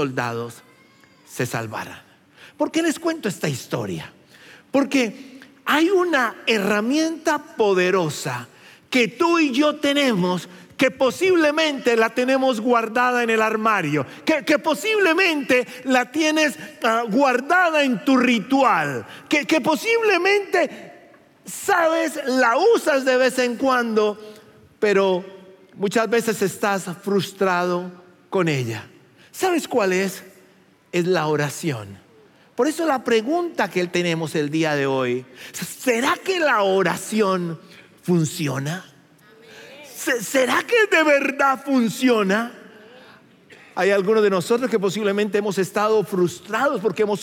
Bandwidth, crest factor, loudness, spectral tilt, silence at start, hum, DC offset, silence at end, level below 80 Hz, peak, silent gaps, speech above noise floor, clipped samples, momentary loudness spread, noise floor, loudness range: 17 kHz; 18 dB; -20 LUFS; -4.5 dB/octave; 0 s; none; under 0.1%; 0 s; -72 dBFS; -4 dBFS; none; 34 dB; under 0.1%; 11 LU; -54 dBFS; 5 LU